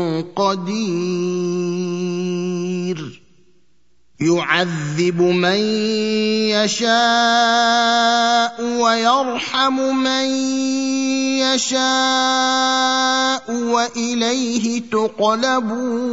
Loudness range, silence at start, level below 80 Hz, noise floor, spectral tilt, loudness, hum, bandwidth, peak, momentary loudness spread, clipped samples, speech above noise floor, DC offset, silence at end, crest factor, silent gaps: 7 LU; 0 s; -64 dBFS; -65 dBFS; -3.5 dB/octave; -17 LUFS; none; 8 kHz; 0 dBFS; 8 LU; under 0.1%; 47 dB; 0.3%; 0 s; 18 dB; none